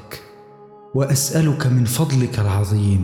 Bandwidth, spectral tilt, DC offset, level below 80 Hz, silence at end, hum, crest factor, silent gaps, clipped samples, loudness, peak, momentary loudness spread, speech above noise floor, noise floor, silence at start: 19.5 kHz; -5.5 dB/octave; under 0.1%; -48 dBFS; 0 s; none; 10 dB; none; under 0.1%; -19 LUFS; -8 dBFS; 8 LU; 26 dB; -43 dBFS; 0 s